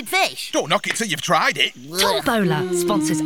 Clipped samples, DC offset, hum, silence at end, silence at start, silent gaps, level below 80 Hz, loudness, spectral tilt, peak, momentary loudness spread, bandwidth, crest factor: under 0.1%; 0.4%; none; 0 s; 0 s; none; -54 dBFS; -19 LUFS; -3.5 dB/octave; -2 dBFS; 3 LU; 19 kHz; 18 dB